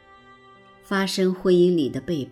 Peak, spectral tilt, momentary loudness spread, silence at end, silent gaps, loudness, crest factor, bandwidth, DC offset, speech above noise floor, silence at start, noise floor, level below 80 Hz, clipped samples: -8 dBFS; -6 dB/octave; 9 LU; 0 s; none; -22 LUFS; 14 dB; 14 kHz; under 0.1%; 30 dB; 0.9 s; -51 dBFS; -58 dBFS; under 0.1%